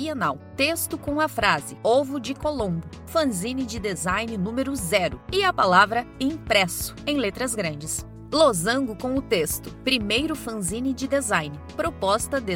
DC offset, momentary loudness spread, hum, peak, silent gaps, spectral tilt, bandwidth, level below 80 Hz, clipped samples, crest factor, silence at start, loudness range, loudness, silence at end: under 0.1%; 9 LU; none; -2 dBFS; none; -3.5 dB/octave; 16.5 kHz; -46 dBFS; under 0.1%; 22 dB; 0 s; 3 LU; -24 LUFS; 0 s